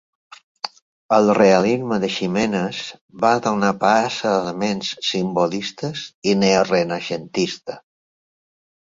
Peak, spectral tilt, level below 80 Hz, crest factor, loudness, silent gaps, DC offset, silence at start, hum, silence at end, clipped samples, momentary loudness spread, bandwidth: -2 dBFS; -5 dB/octave; -58 dBFS; 18 dB; -19 LUFS; 0.82-1.09 s, 3.01-3.08 s, 6.14-6.22 s; under 0.1%; 0.65 s; none; 1.2 s; under 0.1%; 16 LU; 7.8 kHz